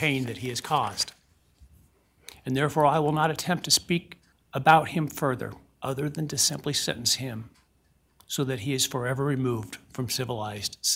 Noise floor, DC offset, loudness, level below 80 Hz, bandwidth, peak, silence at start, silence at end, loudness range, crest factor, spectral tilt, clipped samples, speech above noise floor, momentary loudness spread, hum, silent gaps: -66 dBFS; under 0.1%; -26 LUFS; -60 dBFS; 16.5 kHz; -6 dBFS; 0 s; 0 s; 5 LU; 22 dB; -3.5 dB/octave; under 0.1%; 39 dB; 12 LU; none; none